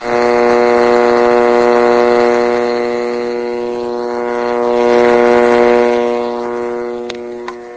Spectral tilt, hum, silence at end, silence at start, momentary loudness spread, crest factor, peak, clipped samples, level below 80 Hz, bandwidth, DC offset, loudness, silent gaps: -5 dB/octave; none; 0 s; 0 s; 10 LU; 12 dB; 0 dBFS; under 0.1%; -46 dBFS; 8 kHz; under 0.1%; -12 LUFS; none